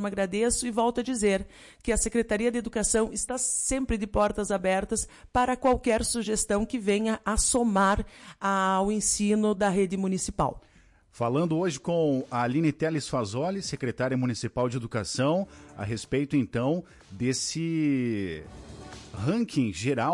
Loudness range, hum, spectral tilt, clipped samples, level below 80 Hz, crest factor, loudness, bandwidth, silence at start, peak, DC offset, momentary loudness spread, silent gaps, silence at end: 4 LU; none; -4.5 dB/octave; under 0.1%; -44 dBFS; 14 dB; -27 LUFS; 11.5 kHz; 0 s; -12 dBFS; under 0.1%; 8 LU; none; 0 s